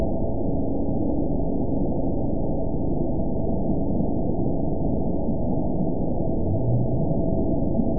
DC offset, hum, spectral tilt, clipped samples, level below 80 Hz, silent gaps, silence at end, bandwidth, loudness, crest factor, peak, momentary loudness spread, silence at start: 5%; none; -19 dB/octave; under 0.1%; -32 dBFS; none; 0 s; 1 kHz; -25 LUFS; 14 dB; -10 dBFS; 2 LU; 0 s